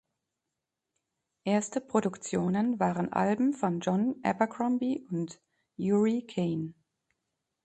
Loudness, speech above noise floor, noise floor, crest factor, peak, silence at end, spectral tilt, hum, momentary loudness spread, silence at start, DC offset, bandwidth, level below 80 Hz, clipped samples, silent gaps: -30 LUFS; 58 dB; -87 dBFS; 20 dB; -10 dBFS; 0.95 s; -6.5 dB/octave; none; 9 LU; 1.45 s; under 0.1%; 8.8 kHz; -70 dBFS; under 0.1%; none